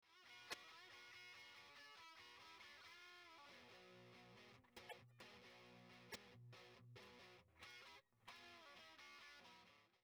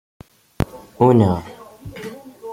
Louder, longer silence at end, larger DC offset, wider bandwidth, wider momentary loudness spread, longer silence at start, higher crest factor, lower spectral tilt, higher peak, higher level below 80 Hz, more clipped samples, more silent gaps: second, -62 LUFS vs -18 LUFS; about the same, 0 s vs 0 s; neither; first, over 20 kHz vs 16 kHz; second, 6 LU vs 24 LU; second, 0 s vs 0.6 s; first, 28 dB vs 18 dB; second, -2.5 dB/octave vs -8.5 dB/octave; second, -36 dBFS vs -2 dBFS; second, -90 dBFS vs -42 dBFS; neither; neither